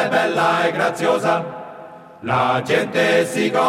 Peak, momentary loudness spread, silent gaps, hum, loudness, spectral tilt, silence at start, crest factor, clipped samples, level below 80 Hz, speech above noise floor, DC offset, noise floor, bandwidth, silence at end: -4 dBFS; 15 LU; none; none; -18 LUFS; -4.5 dB/octave; 0 s; 14 dB; under 0.1%; -62 dBFS; 21 dB; under 0.1%; -39 dBFS; 16 kHz; 0 s